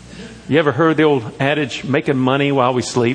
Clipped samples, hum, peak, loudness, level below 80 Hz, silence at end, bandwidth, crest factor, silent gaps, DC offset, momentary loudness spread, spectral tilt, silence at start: under 0.1%; none; 0 dBFS; -16 LUFS; -52 dBFS; 0 s; 10 kHz; 16 dB; none; under 0.1%; 5 LU; -6 dB/octave; 0.05 s